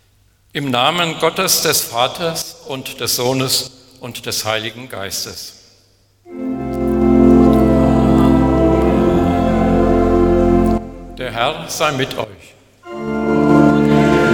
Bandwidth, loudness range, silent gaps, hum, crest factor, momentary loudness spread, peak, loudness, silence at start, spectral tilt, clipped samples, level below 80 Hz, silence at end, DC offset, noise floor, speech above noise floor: 19 kHz; 8 LU; none; none; 16 dB; 16 LU; 0 dBFS; -15 LUFS; 0.55 s; -5 dB/octave; under 0.1%; -28 dBFS; 0 s; under 0.1%; -54 dBFS; 35 dB